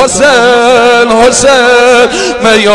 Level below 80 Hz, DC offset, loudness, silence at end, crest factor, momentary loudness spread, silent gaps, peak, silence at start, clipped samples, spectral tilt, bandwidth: -34 dBFS; under 0.1%; -5 LUFS; 0 s; 4 dB; 2 LU; none; 0 dBFS; 0 s; 10%; -2 dB/octave; 12 kHz